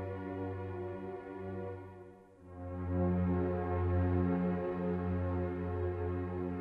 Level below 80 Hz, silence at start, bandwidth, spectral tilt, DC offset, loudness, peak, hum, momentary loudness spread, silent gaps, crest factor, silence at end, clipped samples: -54 dBFS; 0 s; 4.1 kHz; -11 dB/octave; under 0.1%; -36 LUFS; -20 dBFS; none; 13 LU; none; 16 dB; 0 s; under 0.1%